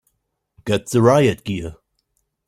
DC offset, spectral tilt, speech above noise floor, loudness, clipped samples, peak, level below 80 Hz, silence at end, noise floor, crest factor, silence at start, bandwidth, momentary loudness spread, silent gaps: under 0.1%; -6 dB/octave; 55 dB; -18 LUFS; under 0.1%; -2 dBFS; -50 dBFS; 0.75 s; -72 dBFS; 18 dB; 0.65 s; 16 kHz; 18 LU; none